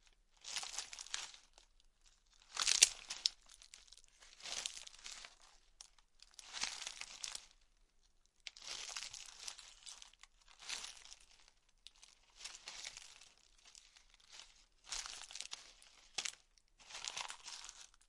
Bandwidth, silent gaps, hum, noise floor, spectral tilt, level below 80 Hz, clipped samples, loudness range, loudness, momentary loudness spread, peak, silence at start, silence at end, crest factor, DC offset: 12 kHz; none; none; -73 dBFS; 3 dB/octave; -72 dBFS; under 0.1%; 15 LU; -41 LUFS; 22 LU; -2 dBFS; 0.4 s; 0.2 s; 44 dB; under 0.1%